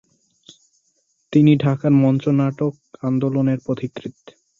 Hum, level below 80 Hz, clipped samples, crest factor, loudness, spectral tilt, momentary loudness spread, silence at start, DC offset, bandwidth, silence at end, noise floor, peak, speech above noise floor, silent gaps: none; -60 dBFS; under 0.1%; 16 dB; -19 LUFS; -9 dB/octave; 13 LU; 1.3 s; under 0.1%; 7.2 kHz; 0.5 s; -67 dBFS; -4 dBFS; 49 dB; none